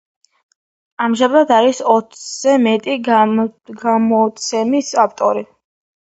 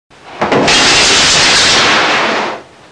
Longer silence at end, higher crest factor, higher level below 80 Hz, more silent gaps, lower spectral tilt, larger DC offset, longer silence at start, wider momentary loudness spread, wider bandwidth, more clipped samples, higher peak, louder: first, 0.6 s vs 0.3 s; first, 16 dB vs 10 dB; second, -66 dBFS vs -36 dBFS; neither; first, -4 dB/octave vs -1 dB/octave; second, under 0.1% vs 0.2%; first, 1 s vs 0.25 s; second, 7 LU vs 12 LU; second, 8.2 kHz vs 10.5 kHz; neither; about the same, 0 dBFS vs 0 dBFS; second, -15 LUFS vs -7 LUFS